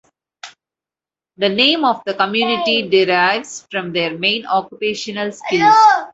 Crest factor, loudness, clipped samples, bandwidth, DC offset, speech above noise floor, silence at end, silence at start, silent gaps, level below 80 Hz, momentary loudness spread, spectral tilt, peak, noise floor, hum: 16 dB; -16 LUFS; under 0.1%; 8 kHz; under 0.1%; over 74 dB; 0.05 s; 0.45 s; none; -64 dBFS; 11 LU; -3.5 dB/octave; 0 dBFS; under -90 dBFS; none